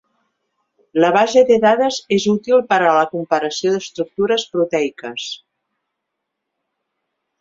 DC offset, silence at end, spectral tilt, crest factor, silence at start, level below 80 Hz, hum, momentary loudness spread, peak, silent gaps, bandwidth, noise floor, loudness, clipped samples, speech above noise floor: under 0.1%; 2.05 s; -4.5 dB/octave; 18 dB; 0.95 s; -62 dBFS; none; 13 LU; 0 dBFS; none; 7.8 kHz; -78 dBFS; -16 LUFS; under 0.1%; 62 dB